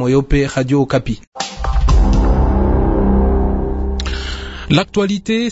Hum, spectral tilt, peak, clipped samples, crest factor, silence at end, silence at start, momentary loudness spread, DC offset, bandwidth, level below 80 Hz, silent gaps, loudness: none; -6.5 dB/octave; 0 dBFS; under 0.1%; 14 dB; 0 s; 0 s; 9 LU; under 0.1%; 8 kHz; -18 dBFS; 1.27-1.32 s; -16 LUFS